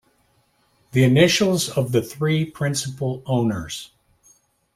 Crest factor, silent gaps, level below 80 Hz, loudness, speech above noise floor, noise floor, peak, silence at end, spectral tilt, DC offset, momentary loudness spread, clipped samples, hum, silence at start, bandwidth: 20 dB; none; -54 dBFS; -20 LUFS; 43 dB; -63 dBFS; -2 dBFS; 0.9 s; -5 dB/octave; under 0.1%; 12 LU; under 0.1%; none; 0.95 s; 16 kHz